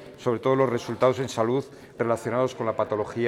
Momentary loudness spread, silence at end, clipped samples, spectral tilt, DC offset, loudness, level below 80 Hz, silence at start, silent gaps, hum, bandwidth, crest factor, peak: 6 LU; 0 s; under 0.1%; -6.5 dB/octave; under 0.1%; -26 LUFS; -64 dBFS; 0 s; none; none; 15 kHz; 18 dB; -6 dBFS